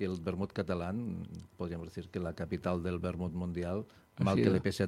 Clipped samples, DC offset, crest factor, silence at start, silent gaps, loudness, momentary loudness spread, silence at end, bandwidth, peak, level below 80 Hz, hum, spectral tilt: under 0.1%; under 0.1%; 22 dB; 0 s; none; -36 LUFS; 13 LU; 0 s; 13.5 kHz; -12 dBFS; -56 dBFS; none; -7.5 dB/octave